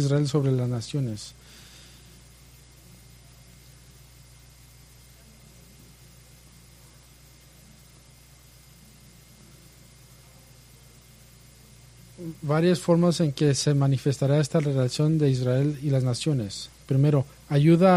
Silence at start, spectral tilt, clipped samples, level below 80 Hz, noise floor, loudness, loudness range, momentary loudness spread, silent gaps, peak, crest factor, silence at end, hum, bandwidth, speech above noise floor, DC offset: 0 s; -6.5 dB/octave; under 0.1%; -56 dBFS; -52 dBFS; -24 LUFS; 15 LU; 18 LU; none; -6 dBFS; 20 dB; 0 s; none; 15 kHz; 30 dB; under 0.1%